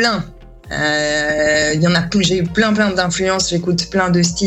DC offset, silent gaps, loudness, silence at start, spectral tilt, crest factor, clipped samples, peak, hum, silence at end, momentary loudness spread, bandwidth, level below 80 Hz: under 0.1%; none; -15 LUFS; 0 s; -4 dB/octave; 14 dB; under 0.1%; -2 dBFS; none; 0 s; 4 LU; 10 kHz; -40 dBFS